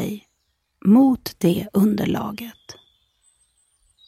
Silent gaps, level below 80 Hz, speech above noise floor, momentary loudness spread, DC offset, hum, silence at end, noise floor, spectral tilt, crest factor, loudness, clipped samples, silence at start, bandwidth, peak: none; -54 dBFS; 52 dB; 19 LU; under 0.1%; none; 1.35 s; -71 dBFS; -7 dB/octave; 16 dB; -20 LUFS; under 0.1%; 0 s; 16 kHz; -6 dBFS